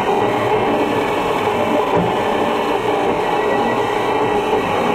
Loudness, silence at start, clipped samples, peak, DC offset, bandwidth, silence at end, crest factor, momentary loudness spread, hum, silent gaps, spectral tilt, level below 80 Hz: -17 LUFS; 0 s; under 0.1%; -4 dBFS; under 0.1%; 16 kHz; 0 s; 12 dB; 1 LU; none; none; -5.5 dB/octave; -46 dBFS